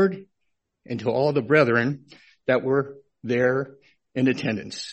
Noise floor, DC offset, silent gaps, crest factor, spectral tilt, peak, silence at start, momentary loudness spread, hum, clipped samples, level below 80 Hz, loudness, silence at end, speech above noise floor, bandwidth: -76 dBFS; under 0.1%; none; 20 dB; -6.5 dB/octave; -4 dBFS; 0 s; 17 LU; none; under 0.1%; -64 dBFS; -23 LUFS; 0 s; 54 dB; 8.4 kHz